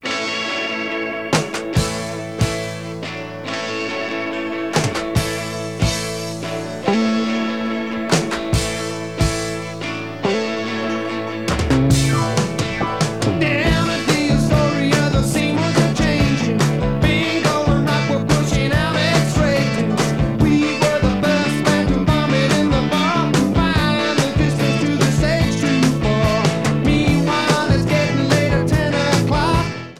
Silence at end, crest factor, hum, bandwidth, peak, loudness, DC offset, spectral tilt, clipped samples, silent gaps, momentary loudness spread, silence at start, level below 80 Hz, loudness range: 0 s; 16 dB; none; 15.5 kHz; 0 dBFS; -18 LUFS; 0.6%; -5.5 dB/octave; under 0.1%; none; 7 LU; 0 s; -32 dBFS; 6 LU